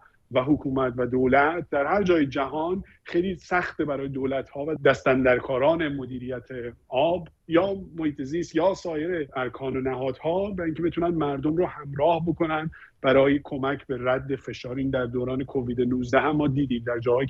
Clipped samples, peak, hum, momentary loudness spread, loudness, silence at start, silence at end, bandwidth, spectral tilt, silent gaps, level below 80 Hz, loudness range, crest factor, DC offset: under 0.1%; -6 dBFS; none; 9 LU; -25 LUFS; 0.3 s; 0 s; 7.8 kHz; -7.5 dB/octave; none; -50 dBFS; 3 LU; 18 dB; under 0.1%